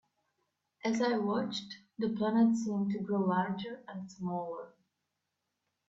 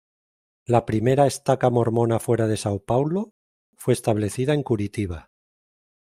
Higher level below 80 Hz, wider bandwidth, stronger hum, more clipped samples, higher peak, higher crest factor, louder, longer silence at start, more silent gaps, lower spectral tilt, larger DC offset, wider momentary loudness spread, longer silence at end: second, -76 dBFS vs -54 dBFS; second, 7.8 kHz vs 15.5 kHz; neither; neither; second, -18 dBFS vs -4 dBFS; about the same, 18 dB vs 20 dB; second, -33 LUFS vs -23 LUFS; first, 0.85 s vs 0.7 s; second, none vs 3.31-3.73 s; about the same, -6.5 dB/octave vs -6.5 dB/octave; neither; first, 14 LU vs 10 LU; first, 1.2 s vs 1 s